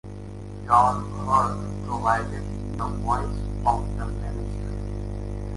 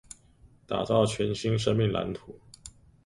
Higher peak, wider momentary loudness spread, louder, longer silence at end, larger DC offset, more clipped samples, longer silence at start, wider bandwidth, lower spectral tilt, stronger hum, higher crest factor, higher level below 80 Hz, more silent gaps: first, -4 dBFS vs -10 dBFS; second, 12 LU vs 23 LU; about the same, -26 LUFS vs -28 LUFS; second, 0 s vs 0.35 s; neither; neither; second, 0.05 s vs 0.7 s; about the same, 11.5 kHz vs 11.5 kHz; about the same, -7 dB/octave vs -6 dB/octave; first, 50 Hz at -30 dBFS vs none; about the same, 20 dB vs 20 dB; first, -34 dBFS vs -54 dBFS; neither